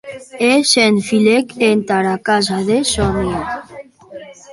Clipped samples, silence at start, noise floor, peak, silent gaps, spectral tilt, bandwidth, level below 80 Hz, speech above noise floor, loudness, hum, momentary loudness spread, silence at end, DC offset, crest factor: under 0.1%; 0.05 s; -37 dBFS; 0 dBFS; none; -4 dB/octave; 11.5 kHz; -38 dBFS; 22 dB; -14 LUFS; none; 15 LU; 0 s; under 0.1%; 16 dB